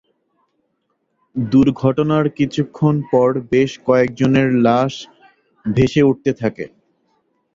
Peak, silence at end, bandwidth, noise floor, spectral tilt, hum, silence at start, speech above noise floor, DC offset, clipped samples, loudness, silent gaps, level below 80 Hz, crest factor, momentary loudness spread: -2 dBFS; 0.9 s; 7.6 kHz; -69 dBFS; -7.5 dB/octave; none; 1.35 s; 53 dB; under 0.1%; under 0.1%; -16 LUFS; none; -48 dBFS; 16 dB; 11 LU